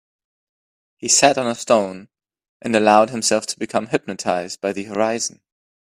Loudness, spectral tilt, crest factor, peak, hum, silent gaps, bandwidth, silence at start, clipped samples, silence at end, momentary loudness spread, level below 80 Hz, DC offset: -19 LUFS; -2.5 dB/octave; 20 dB; 0 dBFS; none; 2.49-2.60 s; 15.5 kHz; 1.05 s; under 0.1%; 0.55 s; 13 LU; -64 dBFS; under 0.1%